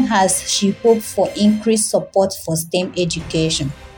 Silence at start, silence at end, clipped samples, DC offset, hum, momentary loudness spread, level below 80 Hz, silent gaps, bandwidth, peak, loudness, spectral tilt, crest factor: 0 s; 0 s; under 0.1%; under 0.1%; none; 5 LU; -44 dBFS; none; 17.5 kHz; -2 dBFS; -17 LUFS; -4 dB/octave; 16 dB